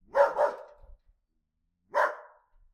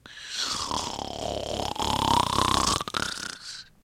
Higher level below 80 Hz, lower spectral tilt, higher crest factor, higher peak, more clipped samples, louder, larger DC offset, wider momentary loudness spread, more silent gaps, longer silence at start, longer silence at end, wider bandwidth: second, -62 dBFS vs -44 dBFS; about the same, -3 dB/octave vs -2.5 dB/octave; about the same, 22 dB vs 26 dB; second, -8 dBFS vs -2 dBFS; neither; about the same, -28 LUFS vs -27 LUFS; neither; first, 20 LU vs 12 LU; neither; about the same, 0.15 s vs 0.05 s; first, 0.5 s vs 0.2 s; second, 12.5 kHz vs 16.5 kHz